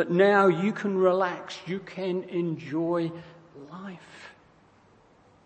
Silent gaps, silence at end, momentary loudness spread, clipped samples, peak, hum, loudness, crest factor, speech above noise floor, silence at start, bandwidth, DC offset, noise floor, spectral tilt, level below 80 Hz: none; 1.15 s; 24 LU; under 0.1%; -8 dBFS; none; -26 LUFS; 20 dB; 33 dB; 0 s; 8.6 kHz; under 0.1%; -59 dBFS; -7 dB/octave; -72 dBFS